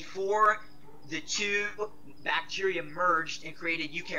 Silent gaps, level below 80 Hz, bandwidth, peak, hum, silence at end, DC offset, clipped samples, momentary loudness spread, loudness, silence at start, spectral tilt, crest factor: none; -64 dBFS; 15.5 kHz; -12 dBFS; none; 0 s; 0.8%; under 0.1%; 13 LU; -30 LUFS; 0 s; -2.5 dB/octave; 20 dB